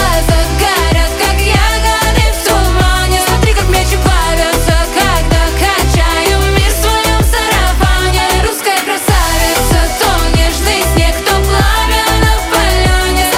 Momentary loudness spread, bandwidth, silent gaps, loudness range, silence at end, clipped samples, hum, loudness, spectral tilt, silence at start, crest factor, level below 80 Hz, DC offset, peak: 1 LU; 16.5 kHz; none; 0 LU; 0 s; under 0.1%; none; -11 LUFS; -4 dB/octave; 0 s; 10 dB; -14 dBFS; under 0.1%; 0 dBFS